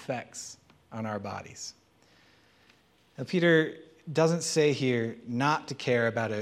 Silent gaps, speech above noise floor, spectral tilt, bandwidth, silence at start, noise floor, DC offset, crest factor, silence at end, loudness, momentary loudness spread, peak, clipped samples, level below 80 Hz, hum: none; 35 dB; -5 dB/octave; 14 kHz; 0 s; -63 dBFS; under 0.1%; 20 dB; 0 s; -28 LUFS; 17 LU; -10 dBFS; under 0.1%; -74 dBFS; none